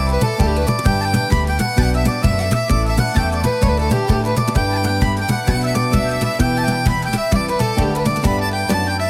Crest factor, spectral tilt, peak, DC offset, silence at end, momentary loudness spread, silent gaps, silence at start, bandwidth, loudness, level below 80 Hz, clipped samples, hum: 16 dB; -5.5 dB/octave; -2 dBFS; under 0.1%; 0 s; 2 LU; none; 0 s; 16.5 kHz; -18 LUFS; -24 dBFS; under 0.1%; none